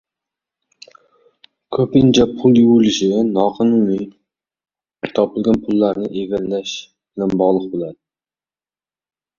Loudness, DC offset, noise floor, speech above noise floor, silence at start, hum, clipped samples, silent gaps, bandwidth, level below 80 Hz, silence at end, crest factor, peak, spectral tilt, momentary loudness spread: -16 LUFS; under 0.1%; under -90 dBFS; over 75 dB; 1.7 s; none; under 0.1%; none; 7.2 kHz; -50 dBFS; 1.45 s; 16 dB; -2 dBFS; -6.5 dB/octave; 14 LU